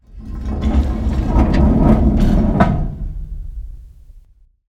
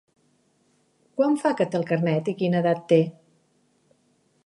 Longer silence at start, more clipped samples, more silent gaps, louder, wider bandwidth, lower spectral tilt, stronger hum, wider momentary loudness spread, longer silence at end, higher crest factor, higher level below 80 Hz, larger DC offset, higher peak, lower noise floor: second, 0.15 s vs 1.15 s; neither; neither; first, -16 LUFS vs -23 LUFS; second, 8 kHz vs 11.5 kHz; first, -9 dB/octave vs -7.5 dB/octave; neither; first, 19 LU vs 4 LU; second, 0.5 s vs 1.35 s; about the same, 16 dB vs 20 dB; first, -20 dBFS vs -72 dBFS; neither; first, 0 dBFS vs -6 dBFS; second, -48 dBFS vs -66 dBFS